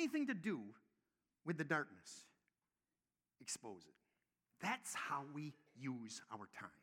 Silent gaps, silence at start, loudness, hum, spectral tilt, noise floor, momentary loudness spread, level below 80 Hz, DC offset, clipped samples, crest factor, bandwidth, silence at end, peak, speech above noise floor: none; 0 s; -46 LUFS; none; -4 dB/octave; under -90 dBFS; 16 LU; under -90 dBFS; under 0.1%; under 0.1%; 24 dB; 17.5 kHz; 0.1 s; -24 dBFS; over 44 dB